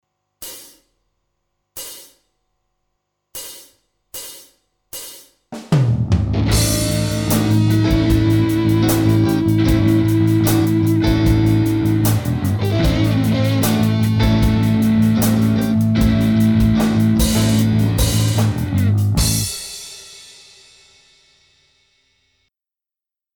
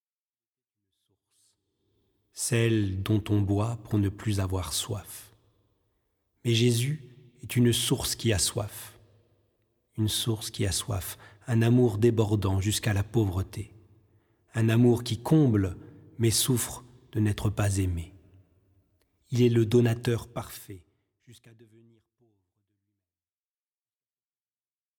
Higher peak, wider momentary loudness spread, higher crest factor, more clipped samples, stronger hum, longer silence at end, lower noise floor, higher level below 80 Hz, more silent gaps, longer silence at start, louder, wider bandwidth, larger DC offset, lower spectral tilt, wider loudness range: first, -4 dBFS vs -10 dBFS; about the same, 18 LU vs 17 LU; second, 12 dB vs 20 dB; neither; neither; second, 3.15 s vs 3.65 s; about the same, -89 dBFS vs under -90 dBFS; first, -30 dBFS vs -52 dBFS; neither; second, 0.4 s vs 2.35 s; first, -16 LUFS vs -27 LUFS; about the same, 19.5 kHz vs 18.5 kHz; neither; about the same, -6 dB/octave vs -5.5 dB/octave; first, 20 LU vs 5 LU